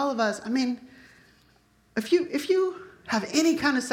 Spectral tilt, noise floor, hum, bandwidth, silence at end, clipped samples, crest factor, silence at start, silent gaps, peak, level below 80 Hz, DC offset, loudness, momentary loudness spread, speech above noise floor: -3.5 dB/octave; -62 dBFS; none; 17 kHz; 0 s; under 0.1%; 18 dB; 0 s; none; -8 dBFS; -66 dBFS; under 0.1%; -26 LUFS; 11 LU; 37 dB